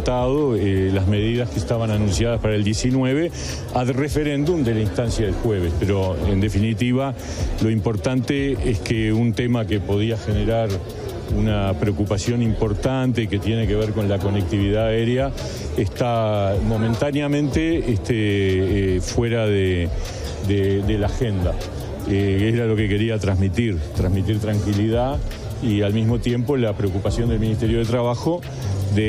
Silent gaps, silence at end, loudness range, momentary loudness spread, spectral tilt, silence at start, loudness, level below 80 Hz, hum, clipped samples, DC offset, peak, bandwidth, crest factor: none; 0 s; 1 LU; 5 LU; -7 dB/octave; 0 s; -21 LUFS; -32 dBFS; none; under 0.1%; under 0.1%; -6 dBFS; 15 kHz; 14 dB